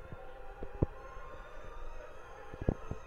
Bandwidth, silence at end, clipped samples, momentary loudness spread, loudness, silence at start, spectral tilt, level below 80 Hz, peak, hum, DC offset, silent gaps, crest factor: 7.6 kHz; 0 s; under 0.1%; 13 LU; -43 LUFS; 0 s; -8.5 dB/octave; -46 dBFS; -12 dBFS; none; under 0.1%; none; 28 dB